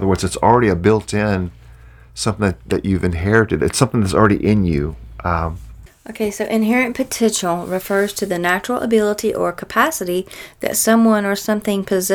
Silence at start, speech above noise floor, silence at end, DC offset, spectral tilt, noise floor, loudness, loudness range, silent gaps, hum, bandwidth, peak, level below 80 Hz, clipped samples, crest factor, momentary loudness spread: 0 s; 25 dB; 0 s; under 0.1%; -5 dB/octave; -42 dBFS; -17 LUFS; 2 LU; none; none; 19 kHz; 0 dBFS; -38 dBFS; under 0.1%; 16 dB; 10 LU